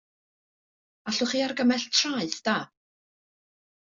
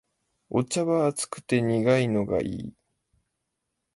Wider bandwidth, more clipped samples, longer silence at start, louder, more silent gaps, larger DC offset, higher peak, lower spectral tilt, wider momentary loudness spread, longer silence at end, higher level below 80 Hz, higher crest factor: second, 7.8 kHz vs 11.5 kHz; neither; first, 1.05 s vs 0.5 s; about the same, -26 LUFS vs -26 LUFS; neither; neither; about the same, -10 dBFS vs -10 dBFS; second, -2.5 dB/octave vs -5.5 dB/octave; about the same, 9 LU vs 11 LU; about the same, 1.35 s vs 1.25 s; second, -72 dBFS vs -58 dBFS; about the same, 20 dB vs 18 dB